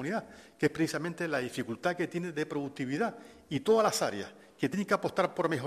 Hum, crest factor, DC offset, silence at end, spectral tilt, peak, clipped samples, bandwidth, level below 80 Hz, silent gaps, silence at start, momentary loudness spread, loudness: none; 20 dB; under 0.1%; 0 s; -5 dB/octave; -12 dBFS; under 0.1%; 14.5 kHz; -70 dBFS; none; 0 s; 10 LU; -32 LUFS